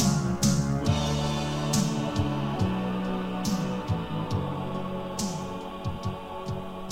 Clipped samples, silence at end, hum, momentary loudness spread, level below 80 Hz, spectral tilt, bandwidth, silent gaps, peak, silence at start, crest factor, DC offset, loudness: under 0.1%; 0 s; none; 10 LU; -44 dBFS; -5.5 dB/octave; 16.5 kHz; none; -12 dBFS; 0 s; 16 dB; 0.3%; -29 LUFS